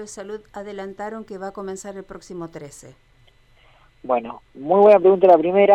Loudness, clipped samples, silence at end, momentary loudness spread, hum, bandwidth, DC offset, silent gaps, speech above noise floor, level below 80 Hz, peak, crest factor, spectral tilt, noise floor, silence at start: -15 LUFS; under 0.1%; 0 s; 24 LU; none; 10.5 kHz; under 0.1%; none; 35 dB; -58 dBFS; -2 dBFS; 16 dB; -6 dB/octave; -54 dBFS; 0 s